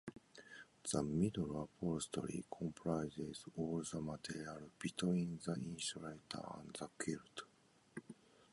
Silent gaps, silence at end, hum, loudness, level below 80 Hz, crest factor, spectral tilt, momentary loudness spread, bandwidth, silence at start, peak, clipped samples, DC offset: none; 0.4 s; none; -44 LUFS; -68 dBFS; 20 dB; -5 dB/octave; 17 LU; 11.5 kHz; 0.05 s; -24 dBFS; under 0.1%; under 0.1%